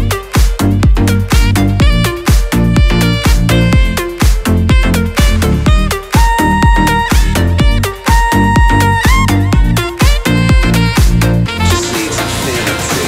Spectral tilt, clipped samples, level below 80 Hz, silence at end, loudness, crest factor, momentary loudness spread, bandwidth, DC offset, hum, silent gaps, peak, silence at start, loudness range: -5 dB/octave; under 0.1%; -14 dBFS; 0 s; -11 LUFS; 10 dB; 4 LU; 16.5 kHz; under 0.1%; none; none; 0 dBFS; 0 s; 1 LU